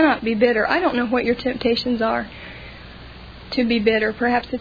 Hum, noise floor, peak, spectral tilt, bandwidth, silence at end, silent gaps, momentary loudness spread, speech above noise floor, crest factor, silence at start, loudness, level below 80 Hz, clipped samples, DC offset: none; -39 dBFS; -2 dBFS; -6.5 dB/octave; 5 kHz; 0 s; none; 21 LU; 19 dB; 18 dB; 0 s; -20 LUFS; -44 dBFS; under 0.1%; under 0.1%